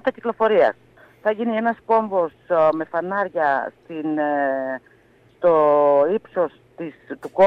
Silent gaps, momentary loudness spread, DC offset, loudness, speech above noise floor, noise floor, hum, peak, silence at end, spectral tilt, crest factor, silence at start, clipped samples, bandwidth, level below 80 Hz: none; 16 LU; under 0.1%; -20 LUFS; 35 dB; -54 dBFS; none; -6 dBFS; 0 s; -7.5 dB/octave; 14 dB; 0.05 s; under 0.1%; 5.6 kHz; -64 dBFS